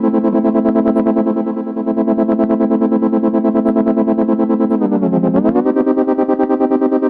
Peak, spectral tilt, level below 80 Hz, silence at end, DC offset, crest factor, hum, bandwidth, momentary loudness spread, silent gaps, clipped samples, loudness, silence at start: -2 dBFS; -11.5 dB/octave; -52 dBFS; 0 s; under 0.1%; 12 dB; none; 4.2 kHz; 2 LU; none; under 0.1%; -14 LUFS; 0 s